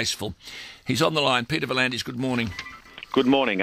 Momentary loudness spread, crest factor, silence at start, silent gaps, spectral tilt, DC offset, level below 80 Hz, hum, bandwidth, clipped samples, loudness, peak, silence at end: 17 LU; 18 dB; 0 s; none; -4 dB/octave; under 0.1%; -56 dBFS; none; 16 kHz; under 0.1%; -24 LUFS; -6 dBFS; 0 s